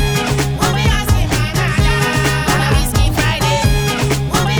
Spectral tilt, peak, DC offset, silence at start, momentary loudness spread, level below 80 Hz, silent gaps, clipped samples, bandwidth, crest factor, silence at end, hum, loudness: -4.5 dB/octave; -2 dBFS; under 0.1%; 0 s; 2 LU; -20 dBFS; none; under 0.1%; over 20 kHz; 12 dB; 0 s; none; -15 LUFS